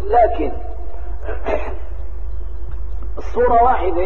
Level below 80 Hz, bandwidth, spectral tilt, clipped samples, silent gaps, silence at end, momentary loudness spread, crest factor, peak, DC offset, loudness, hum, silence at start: -26 dBFS; 6.4 kHz; -8.5 dB/octave; under 0.1%; none; 0 s; 17 LU; 16 dB; -2 dBFS; 10%; -19 LUFS; none; 0 s